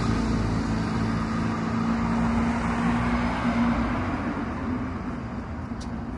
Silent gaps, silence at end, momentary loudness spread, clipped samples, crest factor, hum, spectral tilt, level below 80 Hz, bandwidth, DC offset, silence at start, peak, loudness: none; 0 s; 9 LU; under 0.1%; 14 dB; none; -7 dB/octave; -36 dBFS; 11 kHz; under 0.1%; 0 s; -12 dBFS; -27 LUFS